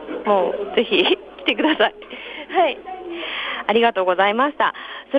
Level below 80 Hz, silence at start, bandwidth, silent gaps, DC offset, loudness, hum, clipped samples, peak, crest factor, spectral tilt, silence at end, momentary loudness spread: -60 dBFS; 0 s; 6 kHz; none; under 0.1%; -19 LUFS; none; under 0.1%; -4 dBFS; 16 dB; -6 dB/octave; 0 s; 14 LU